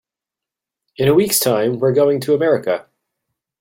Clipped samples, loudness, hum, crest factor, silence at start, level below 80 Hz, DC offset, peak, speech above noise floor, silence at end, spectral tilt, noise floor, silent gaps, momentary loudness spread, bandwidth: under 0.1%; -16 LUFS; none; 16 dB; 1 s; -56 dBFS; under 0.1%; -2 dBFS; 71 dB; 0.8 s; -4.5 dB/octave; -86 dBFS; none; 6 LU; 16.5 kHz